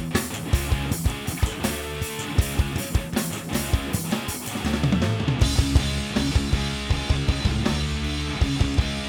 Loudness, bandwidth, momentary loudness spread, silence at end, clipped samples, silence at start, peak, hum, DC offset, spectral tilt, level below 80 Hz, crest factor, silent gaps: -25 LUFS; over 20 kHz; 5 LU; 0 s; under 0.1%; 0 s; -6 dBFS; none; under 0.1%; -5 dB/octave; -28 dBFS; 18 dB; none